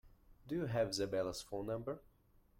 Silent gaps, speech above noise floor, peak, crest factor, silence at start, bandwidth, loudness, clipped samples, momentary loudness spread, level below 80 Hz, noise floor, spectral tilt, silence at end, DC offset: none; 30 dB; -24 dBFS; 18 dB; 0.05 s; 16.5 kHz; -40 LUFS; under 0.1%; 8 LU; -64 dBFS; -69 dBFS; -5 dB/octave; 0.6 s; under 0.1%